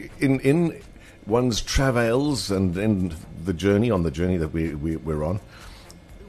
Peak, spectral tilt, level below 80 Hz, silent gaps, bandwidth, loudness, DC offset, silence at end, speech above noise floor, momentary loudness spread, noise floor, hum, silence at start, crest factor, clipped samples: -6 dBFS; -6 dB/octave; -38 dBFS; none; 13 kHz; -23 LUFS; under 0.1%; 0 s; 22 dB; 12 LU; -44 dBFS; none; 0 s; 18 dB; under 0.1%